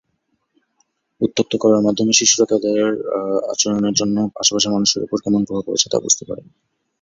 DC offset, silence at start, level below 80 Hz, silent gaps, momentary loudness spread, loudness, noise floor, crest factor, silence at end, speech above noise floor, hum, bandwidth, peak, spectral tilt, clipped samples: under 0.1%; 1.2 s; -58 dBFS; none; 7 LU; -17 LUFS; -70 dBFS; 18 dB; 0.6 s; 52 dB; none; 7.8 kHz; 0 dBFS; -3 dB/octave; under 0.1%